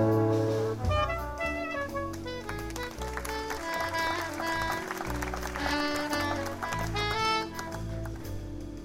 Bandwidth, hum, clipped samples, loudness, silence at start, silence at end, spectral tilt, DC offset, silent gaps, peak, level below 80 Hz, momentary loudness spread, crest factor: 16 kHz; none; under 0.1%; -32 LUFS; 0 s; 0 s; -5 dB/octave; under 0.1%; none; -14 dBFS; -44 dBFS; 9 LU; 16 dB